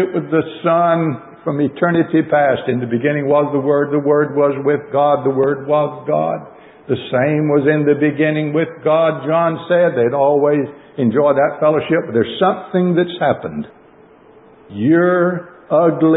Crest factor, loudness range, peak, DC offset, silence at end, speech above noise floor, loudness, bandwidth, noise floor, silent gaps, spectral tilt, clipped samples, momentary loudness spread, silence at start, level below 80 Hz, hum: 14 dB; 3 LU; -2 dBFS; under 0.1%; 0 s; 30 dB; -16 LUFS; 4 kHz; -45 dBFS; none; -12.5 dB/octave; under 0.1%; 6 LU; 0 s; -58 dBFS; none